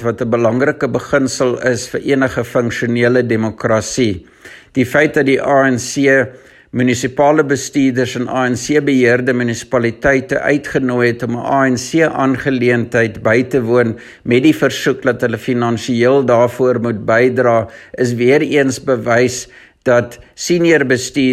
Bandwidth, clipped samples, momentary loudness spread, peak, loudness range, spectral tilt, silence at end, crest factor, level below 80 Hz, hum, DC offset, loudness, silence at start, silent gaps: 13.5 kHz; under 0.1%; 6 LU; 0 dBFS; 2 LU; -5.5 dB/octave; 0 s; 14 dB; -48 dBFS; none; under 0.1%; -14 LUFS; 0 s; none